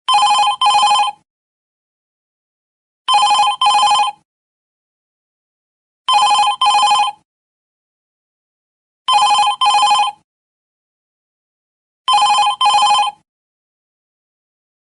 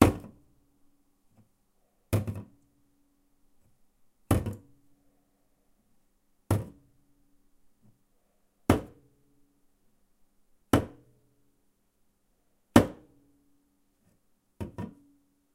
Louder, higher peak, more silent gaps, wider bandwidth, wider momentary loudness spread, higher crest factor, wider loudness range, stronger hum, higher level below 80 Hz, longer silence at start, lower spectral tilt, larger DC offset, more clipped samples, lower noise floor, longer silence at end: first, -13 LUFS vs -29 LUFS; about the same, -4 dBFS vs -2 dBFS; first, 1.30-3.05 s, 4.25-6.05 s, 7.25-9.05 s, 10.24-12.05 s vs none; second, 11.5 kHz vs 16 kHz; second, 9 LU vs 20 LU; second, 12 dB vs 32 dB; second, 0 LU vs 9 LU; neither; second, -66 dBFS vs -50 dBFS; about the same, 0.1 s vs 0 s; second, 2 dB/octave vs -6.5 dB/octave; neither; neither; first, under -90 dBFS vs -71 dBFS; first, 1.85 s vs 0.65 s